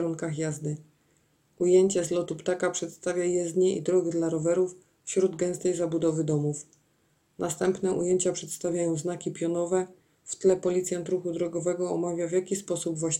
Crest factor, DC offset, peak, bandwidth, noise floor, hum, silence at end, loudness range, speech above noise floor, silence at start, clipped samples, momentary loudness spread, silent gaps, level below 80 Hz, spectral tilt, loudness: 16 dB; under 0.1%; -12 dBFS; 15.5 kHz; -68 dBFS; none; 0 s; 3 LU; 41 dB; 0 s; under 0.1%; 8 LU; none; -68 dBFS; -5.5 dB/octave; -28 LUFS